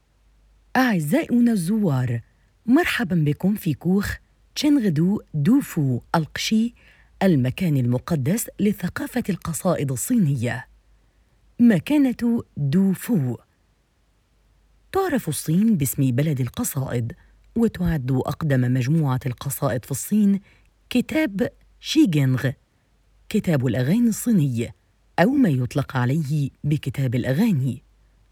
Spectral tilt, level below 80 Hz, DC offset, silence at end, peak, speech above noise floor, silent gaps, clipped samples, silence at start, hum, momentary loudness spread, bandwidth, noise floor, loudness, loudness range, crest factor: -6.5 dB/octave; -48 dBFS; under 0.1%; 0.5 s; -4 dBFS; 43 dB; none; under 0.1%; 0.75 s; none; 8 LU; 19.5 kHz; -63 dBFS; -22 LUFS; 3 LU; 18 dB